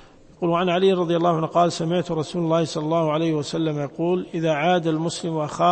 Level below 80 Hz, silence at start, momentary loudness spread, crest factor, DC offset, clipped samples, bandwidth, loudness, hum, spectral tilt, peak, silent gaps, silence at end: -58 dBFS; 0 s; 6 LU; 16 dB; under 0.1%; under 0.1%; 8.8 kHz; -22 LUFS; none; -6 dB/octave; -6 dBFS; none; 0 s